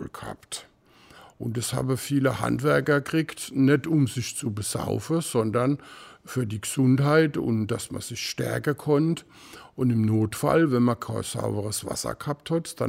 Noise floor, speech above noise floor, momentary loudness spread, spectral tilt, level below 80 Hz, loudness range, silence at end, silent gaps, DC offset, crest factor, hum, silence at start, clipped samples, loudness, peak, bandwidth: -54 dBFS; 29 dB; 12 LU; -5.5 dB/octave; -56 dBFS; 2 LU; 0 s; none; under 0.1%; 18 dB; none; 0 s; under 0.1%; -25 LUFS; -8 dBFS; 16 kHz